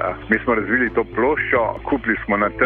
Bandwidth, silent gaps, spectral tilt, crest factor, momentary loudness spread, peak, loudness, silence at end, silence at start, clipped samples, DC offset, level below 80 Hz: 4.4 kHz; none; -9 dB/octave; 16 dB; 3 LU; -4 dBFS; -19 LUFS; 0 s; 0 s; under 0.1%; under 0.1%; -40 dBFS